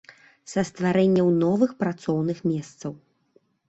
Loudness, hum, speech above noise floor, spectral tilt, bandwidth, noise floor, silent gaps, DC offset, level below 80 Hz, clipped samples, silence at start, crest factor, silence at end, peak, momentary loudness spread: -23 LUFS; none; 41 dB; -7.5 dB/octave; 8.2 kHz; -64 dBFS; none; under 0.1%; -62 dBFS; under 0.1%; 0.5 s; 16 dB; 0.75 s; -8 dBFS; 13 LU